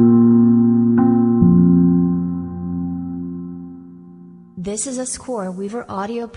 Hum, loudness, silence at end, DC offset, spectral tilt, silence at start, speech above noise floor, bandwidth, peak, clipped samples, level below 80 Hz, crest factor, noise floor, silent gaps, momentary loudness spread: none; -17 LUFS; 0 s; under 0.1%; -7.5 dB/octave; 0 s; 16 dB; 11 kHz; -2 dBFS; under 0.1%; -42 dBFS; 14 dB; -41 dBFS; none; 17 LU